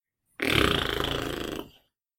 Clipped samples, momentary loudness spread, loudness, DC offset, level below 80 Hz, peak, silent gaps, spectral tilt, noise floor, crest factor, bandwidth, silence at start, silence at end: under 0.1%; 13 LU; -27 LUFS; under 0.1%; -42 dBFS; -6 dBFS; none; -4 dB/octave; -62 dBFS; 24 dB; 17 kHz; 0.4 s; 0.5 s